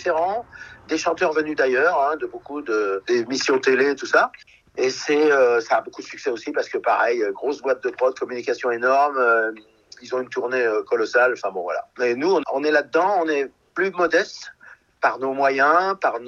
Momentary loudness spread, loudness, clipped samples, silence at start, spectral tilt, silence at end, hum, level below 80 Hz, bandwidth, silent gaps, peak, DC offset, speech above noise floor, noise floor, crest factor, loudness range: 11 LU; -21 LUFS; under 0.1%; 0 s; -3.5 dB/octave; 0 s; none; -66 dBFS; 7.6 kHz; none; -4 dBFS; under 0.1%; 28 dB; -48 dBFS; 18 dB; 2 LU